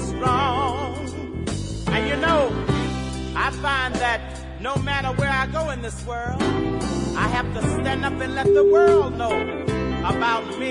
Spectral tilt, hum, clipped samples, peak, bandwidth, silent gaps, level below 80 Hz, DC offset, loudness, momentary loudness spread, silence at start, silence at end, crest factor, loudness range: -5.5 dB/octave; none; under 0.1%; -6 dBFS; 11 kHz; none; -36 dBFS; under 0.1%; -22 LUFS; 11 LU; 0 s; 0 s; 16 dB; 4 LU